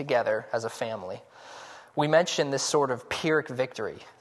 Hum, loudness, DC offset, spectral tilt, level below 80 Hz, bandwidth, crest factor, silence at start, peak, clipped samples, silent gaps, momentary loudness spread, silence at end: none; -28 LUFS; under 0.1%; -4 dB/octave; -68 dBFS; 12.5 kHz; 20 dB; 0 s; -8 dBFS; under 0.1%; none; 20 LU; 0.1 s